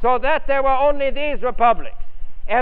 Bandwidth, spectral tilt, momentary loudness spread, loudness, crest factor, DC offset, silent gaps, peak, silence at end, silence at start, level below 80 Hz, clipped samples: 4.2 kHz; -8 dB/octave; 6 LU; -19 LUFS; 14 dB; 4%; none; -2 dBFS; 0 s; 0 s; -30 dBFS; under 0.1%